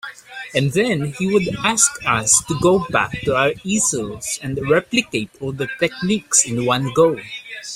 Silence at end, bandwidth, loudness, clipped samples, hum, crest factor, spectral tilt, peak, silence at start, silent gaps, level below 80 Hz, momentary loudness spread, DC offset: 0 s; 16 kHz; -18 LUFS; under 0.1%; none; 18 dB; -3.5 dB/octave; 0 dBFS; 0.05 s; none; -48 dBFS; 10 LU; under 0.1%